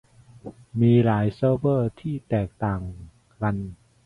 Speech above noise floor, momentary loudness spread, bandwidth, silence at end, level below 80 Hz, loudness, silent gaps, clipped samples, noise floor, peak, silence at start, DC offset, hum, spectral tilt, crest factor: 21 dB; 22 LU; 5 kHz; 0.3 s; -48 dBFS; -24 LUFS; none; under 0.1%; -43 dBFS; -8 dBFS; 0.45 s; under 0.1%; none; -10 dB/octave; 16 dB